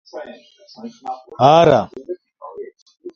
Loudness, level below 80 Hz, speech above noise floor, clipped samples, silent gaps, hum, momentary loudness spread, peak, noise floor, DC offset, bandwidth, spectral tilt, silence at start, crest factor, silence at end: -13 LUFS; -54 dBFS; 18 dB; under 0.1%; 2.82-2.86 s; none; 26 LU; 0 dBFS; -35 dBFS; under 0.1%; 7 kHz; -6.5 dB/octave; 0.15 s; 18 dB; 0.05 s